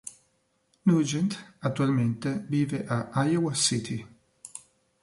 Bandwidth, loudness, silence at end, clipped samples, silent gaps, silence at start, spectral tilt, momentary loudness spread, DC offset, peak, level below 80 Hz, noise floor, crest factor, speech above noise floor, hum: 11.5 kHz; -27 LUFS; 0.45 s; under 0.1%; none; 0.05 s; -5 dB/octave; 19 LU; under 0.1%; -10 dBFS; -64 dBFS; -71 dBFS; 18 dB; 45 dB; none